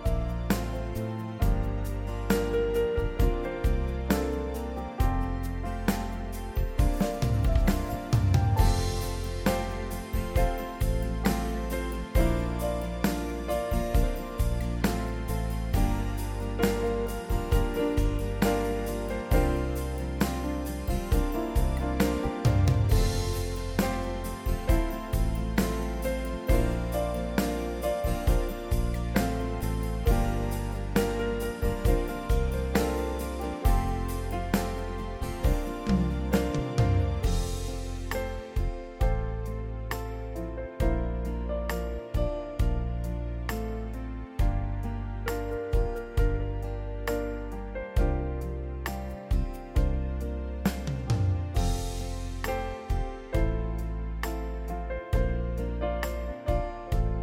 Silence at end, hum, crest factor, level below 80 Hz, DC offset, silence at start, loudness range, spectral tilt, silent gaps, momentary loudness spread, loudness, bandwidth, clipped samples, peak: 0 s; none; 18 dB; -30 dBFS; under 0.1%; 0 s; 5 LU; -6.5 dB/octave; none; 7 LU; -30 LUFS; 17 kHz; under 0.1%; -10 dBFS